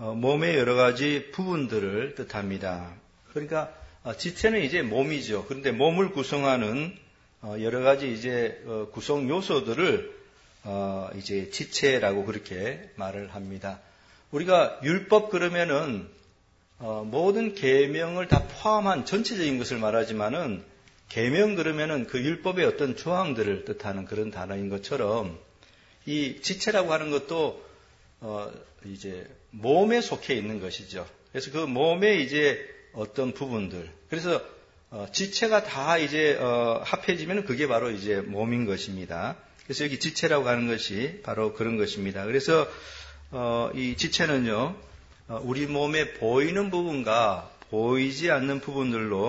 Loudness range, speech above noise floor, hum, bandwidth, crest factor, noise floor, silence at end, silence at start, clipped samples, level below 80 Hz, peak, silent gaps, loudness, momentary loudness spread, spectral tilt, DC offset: 4 LU; 35 dB; none; 8 kHz; 22 dB; -61 dBFS; 0 s; 0 s; under 0.1%; -54 dBFS; -6 dBFS; none; -27 LUFS; 14 LU; -5 dB/octave; under 0.1%